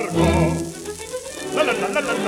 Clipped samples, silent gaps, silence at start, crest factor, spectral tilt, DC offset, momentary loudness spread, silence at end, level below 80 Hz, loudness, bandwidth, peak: under 0.1%; none; 0 s; 16 dB; -5 dB/octave; under 0.1%; 13 LU; 0 s; -36 dBFS; -22 LUFS; 16.5 kHz; -4 dBFS